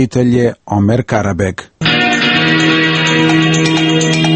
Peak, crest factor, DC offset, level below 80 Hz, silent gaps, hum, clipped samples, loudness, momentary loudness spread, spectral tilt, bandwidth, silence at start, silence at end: 0 dBFS; 12 dB; under 0.1%; -42 dBFS; none; none; under 0.1%; -11 LUFS; 6 LU; -5 dB/octave; 8.8 kHz; 0 s; 0 s